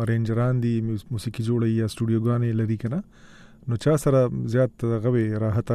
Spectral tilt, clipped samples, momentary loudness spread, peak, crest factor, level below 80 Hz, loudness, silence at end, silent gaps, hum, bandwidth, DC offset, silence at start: -8 dB/octave; under 0.1%; 8 LU; -10 dBFS; 14 dB; -50 dBFS; -24 LUFS; 0 s; none; none; 13 kHz; under 0.1%; 0 s